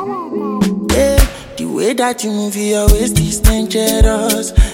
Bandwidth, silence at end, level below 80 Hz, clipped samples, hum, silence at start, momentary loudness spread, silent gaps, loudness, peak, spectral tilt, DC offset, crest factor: 17 kHz; 0 s; -16 dBFS; under 0.1%; none; 0 s; 8 LU; none; -15 LUFS; 0 dBFS; -5 dB/octave; under 0.1%; 14 dB